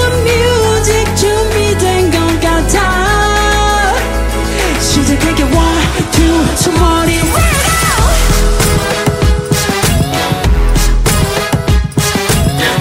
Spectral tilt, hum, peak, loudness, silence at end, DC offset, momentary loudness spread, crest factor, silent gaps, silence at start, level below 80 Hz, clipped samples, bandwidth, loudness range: -4 dB/octave; none; 0 dBFS; -11 LUFS; 0 s; under 0.1%; 3 LU; 10 dB; none; 0 s; -16 dBFS; under 0.1%; 16.5 kHz; 2 LU